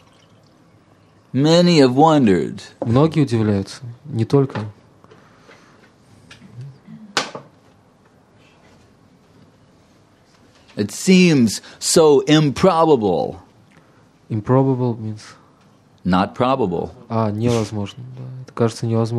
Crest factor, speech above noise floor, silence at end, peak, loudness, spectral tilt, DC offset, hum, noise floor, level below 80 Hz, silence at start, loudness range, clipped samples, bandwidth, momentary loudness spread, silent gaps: 18 dB; 36 dB; 0 s; 0 dBFS; -17 LUFS; -6 dB/octave; under 0.1%; none; -53 dBFS; -54 dBFS; 1.35 s; 16 LU; under 0.1%; 14 kHz; 21 LU; none